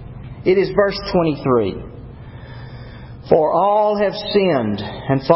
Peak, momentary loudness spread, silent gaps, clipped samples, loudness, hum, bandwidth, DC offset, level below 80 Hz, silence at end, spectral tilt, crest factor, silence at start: 0 dBFS; 21 LU; none; under 0.1%; -17 LUFS; none; 5.8 kHz; under 0.1%; -42 dBFS; 0 s; -10.5 dB/octave; 18 dB; 0 s